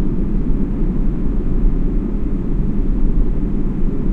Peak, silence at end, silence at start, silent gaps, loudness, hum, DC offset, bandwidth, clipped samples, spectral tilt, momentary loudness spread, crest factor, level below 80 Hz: -2 dBFS; 0 s; 0 s; none; -21 LUFS; none; under 0.1%; 2.6 kHz; under 0.1%; -11 dB/octave; 2 LU; 12 dB; -16 dBFS